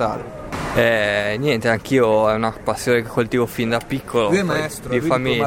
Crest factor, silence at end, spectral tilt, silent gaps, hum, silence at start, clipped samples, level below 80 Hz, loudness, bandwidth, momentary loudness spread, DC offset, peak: 14 dB; 0 s; -5.5 dB/octave; none; none; 0 s; under 0.1%; -44 dBFS; -19 LUFS; 17 kHz; 7 LU; under 0.1%; -4 dBFS